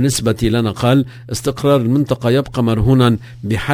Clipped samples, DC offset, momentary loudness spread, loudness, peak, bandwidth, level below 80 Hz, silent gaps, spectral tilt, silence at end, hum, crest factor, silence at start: under 0.1%; under 0.1%; 9 LU; -16 LUFS; 0 dBFS; 16 kHz; -34 dBFS; none; -6 dB/octave; 0 s; none; 14 dB; 0 s